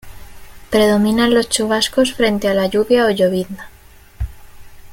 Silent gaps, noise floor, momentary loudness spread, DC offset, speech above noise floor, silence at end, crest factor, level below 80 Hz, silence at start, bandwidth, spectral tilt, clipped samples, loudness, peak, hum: none; -36 dBFS; 16 LU; under 0.1%; 22 dB; 0 s; 16 dB; -38 dBFS; 0.05 s; 17 kHz; -4 dB/octave; under 0.1%; -15 LUFS; -2 dBFS; none